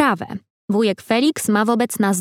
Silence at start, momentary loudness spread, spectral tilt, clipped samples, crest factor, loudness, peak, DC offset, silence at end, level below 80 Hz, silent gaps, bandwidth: 0 s; 10 LU; -4.5 dB/octave; under 0.1%; 16 dB; -19 LUFS; -2 dBFS; under 0.1%; 0 s; -64 dBFS; 0.50-0.68 s; 16.5 kHz